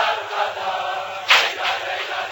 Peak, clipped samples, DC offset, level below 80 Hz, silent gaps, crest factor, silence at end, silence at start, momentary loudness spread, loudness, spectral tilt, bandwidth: -2 dBFS; under 0.1%; under 0.1%; -64 dBFS; none; 20 dB; 0 s; 0 s; 10 LU; -20 LUFS; 0.5 dB/octave; 17 kHz